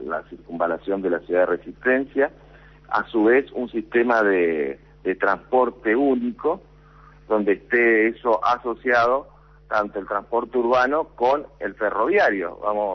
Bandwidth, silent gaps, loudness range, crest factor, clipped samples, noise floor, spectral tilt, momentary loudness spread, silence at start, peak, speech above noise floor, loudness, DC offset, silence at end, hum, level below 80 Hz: 6.4 kHz; none; 2 LU; 14 dB; under 0.1%; -49 dBFS; -6.5 dB/octave; 8 LU; 0 s; -8 dBFS; 27 dB; -22 LUFS; under 0.1%; 0 s; none; -54 dBFS